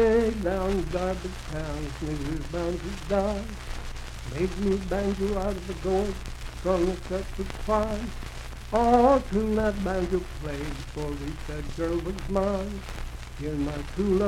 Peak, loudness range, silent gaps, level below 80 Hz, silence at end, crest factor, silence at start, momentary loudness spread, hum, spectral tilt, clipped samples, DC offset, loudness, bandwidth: -8 dBFS; 6 LU; none; -36 dBFS; 0 s; 20 dB; 0 s; 13 LU; none; -6.5 dB/octave; under 0.1%; under 0.1%; -28 LUFS; 16 kHz